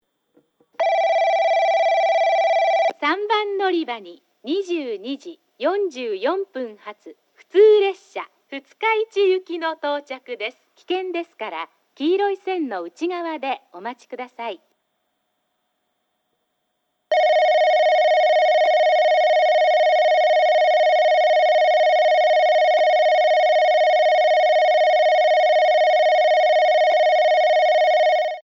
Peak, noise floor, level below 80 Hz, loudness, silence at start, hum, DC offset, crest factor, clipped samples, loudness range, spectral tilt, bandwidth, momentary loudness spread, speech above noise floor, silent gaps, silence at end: -6 dBFS; -73 dBFS; -86 dBFS; -18 LUFS; 0.8 s; none; under 0.1%; 14 dB; under 0.1%; 10 LU; -2 dB/octave; 7.2 kHz; 15 LU; 50 dB; none; 0.05 s